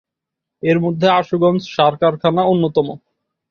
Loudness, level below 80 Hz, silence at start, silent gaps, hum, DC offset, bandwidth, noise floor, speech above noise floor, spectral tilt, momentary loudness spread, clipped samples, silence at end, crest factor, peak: -16 LUFS; -58 dBFS; 0.65 s; none; none; under 0.1%; 6.8 kHz; -82 dBFS; 67 dB; -7.5 dB/octave; 5 LU; under 0.1%; 0.55 s; 16 dB; -2 dBFS